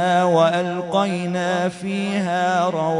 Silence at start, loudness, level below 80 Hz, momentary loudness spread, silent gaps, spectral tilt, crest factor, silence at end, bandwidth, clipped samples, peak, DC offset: 0 s; -20 LUFS; -64 dBFS; 6 LU; none; -5.5 dB/octave; 16 dB; 0 s; 11 kHz; under 0.1%; -4 dBFS; under 0.1%